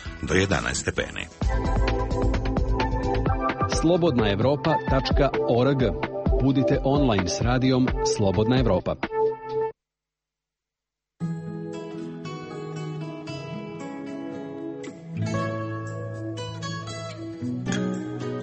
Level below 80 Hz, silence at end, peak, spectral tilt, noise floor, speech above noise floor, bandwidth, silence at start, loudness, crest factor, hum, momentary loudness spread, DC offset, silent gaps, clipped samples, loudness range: -34 dBFS; 0 s; -6 dBFS; -6 dB/octave; -88 dBFS; 65 dB; 8.4 kHz; 0 s; -26 LUFS; 18 dB; none; 13 LU; under 0.1%; none; under 0.1%; 12 LU